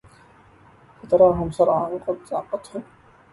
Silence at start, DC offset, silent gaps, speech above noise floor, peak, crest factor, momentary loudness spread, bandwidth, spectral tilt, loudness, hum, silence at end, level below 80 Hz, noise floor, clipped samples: 1.05 s; under 0.1%; none; 31 dB; -4 dBFS; 18 dB; 15 LU; 11.5 kHz; -8 dB/octave; -21 LUFS; none; 0.5 s; -48 dBFS; -52 dBFS; under 0.1%